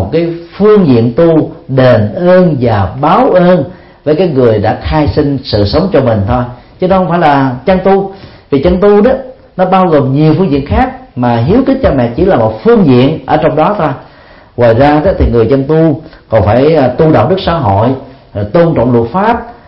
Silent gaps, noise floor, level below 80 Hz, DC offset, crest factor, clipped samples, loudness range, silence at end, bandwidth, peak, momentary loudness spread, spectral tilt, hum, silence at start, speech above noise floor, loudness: none; -32 dBFS; -26 dBFS; under 0.1%; 8 dB; 0.2%; 2 LU; 0.15 s; 5.8 kHz; 0 dBFS; 8 LU; -10.5 dB/octave; none; 0 s; 24 dB; -9 LUFS